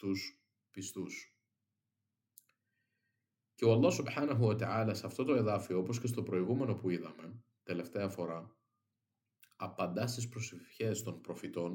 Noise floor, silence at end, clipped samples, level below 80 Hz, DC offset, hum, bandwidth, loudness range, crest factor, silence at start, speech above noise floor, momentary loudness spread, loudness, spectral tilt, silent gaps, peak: -88 dBFS; 0 s; under 0.1%; -80 dBFS; under 0.1%; none; 17 kHz; 9 LU; 22 dB; 0 s; 52 dB; 15 LU; -36 LUFS; -6 dB/octave; none; -16 dBFS